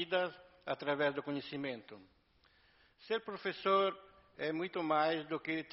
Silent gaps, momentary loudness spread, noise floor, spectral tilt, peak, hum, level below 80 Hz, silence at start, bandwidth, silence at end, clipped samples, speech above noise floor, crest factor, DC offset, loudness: none; 11 LU; -70 dBFS; -2.5 dB/octave; -18 dBFS; none; -78 dBFS; 0 s; 5.8 kHz; 0.05 s; under 0.1%; 33 dB; 20 dB; under 0.1%; -37 LUFS